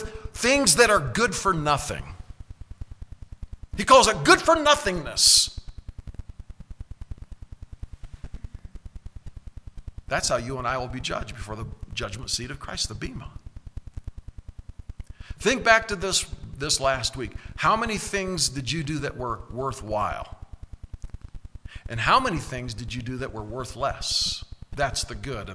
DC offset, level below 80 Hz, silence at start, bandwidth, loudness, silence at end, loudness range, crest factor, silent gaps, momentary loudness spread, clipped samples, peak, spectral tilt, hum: under 0.1%; -40 dBFS; 0 s; 11 kHz; -23 LUFS; 0 s; 15 LU; 26 dB; none; 27 LU; under 0.1%; -2 dBFS; -2.5 dB/octave; none